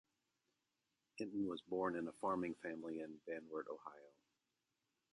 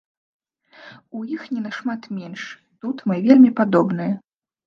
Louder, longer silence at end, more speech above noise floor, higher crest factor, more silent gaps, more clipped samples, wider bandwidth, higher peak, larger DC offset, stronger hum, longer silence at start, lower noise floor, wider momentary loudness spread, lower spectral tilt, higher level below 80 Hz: second, -45 LUFS vs -19 LUFS; first, 1.05 s vs 0.5 s; first, 44 dB vs 30 dB; about the same, 20 dB vs 20 dB; neither; neither; first, 11 kHz vs 6.6 kHz; second, -28 dBFS vs 0 dBFS; neither; neither; first, 1.15 s vs 0.85 s; first, -89 dBFS vs -49 dBFS; second, 11 LU vs 20 LU; second, -6.5 dB/octave vs -8 dB/octave; second, -82 dBFS vs -70 dBFS